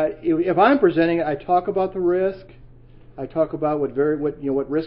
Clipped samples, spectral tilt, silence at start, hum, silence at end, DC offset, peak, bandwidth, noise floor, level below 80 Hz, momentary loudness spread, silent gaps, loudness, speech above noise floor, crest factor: under 0.1%; -11.5 dB/octave; 0 s; none; 0 s; under 0.1%; -4 dBFS; 5.4 kHz; -45 dBFS; -48 dBFS; 9 LU; none; -20 LUFS; 25 dB; 18 dB